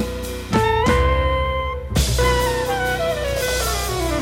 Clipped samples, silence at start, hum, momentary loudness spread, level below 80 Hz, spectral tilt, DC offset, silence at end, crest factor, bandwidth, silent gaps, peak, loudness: under 0.1%; 0 s; none; 6 LU; -26 dBFS; -4.5 dB/octave; under 0.1%; 0 s; 14 dB; 17 kHz; none; -6 dBFS; -20 LUFS